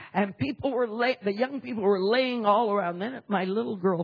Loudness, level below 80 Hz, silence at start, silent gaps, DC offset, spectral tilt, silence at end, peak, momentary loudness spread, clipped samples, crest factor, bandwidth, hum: -27 LUFS; -66 dBFS; 0 s; none; under 0.1%; -8.5 dB/octave; 0 s; -10 dBFS; 6 LU; under 0.1%; 18 dB; 5.2 kHz; none